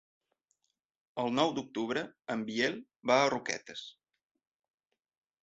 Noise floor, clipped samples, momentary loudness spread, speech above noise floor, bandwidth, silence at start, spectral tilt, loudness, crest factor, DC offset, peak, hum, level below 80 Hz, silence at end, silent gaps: -80 dBFS; under 0.1%; 17 LU; 47 dB; 8 kHz; 1.15 s; -2.5 dB/octave; -32 LUFS; 22 dB; under 0.1%; -12 dBFS; none; -76 dBFS; 1.5 s; none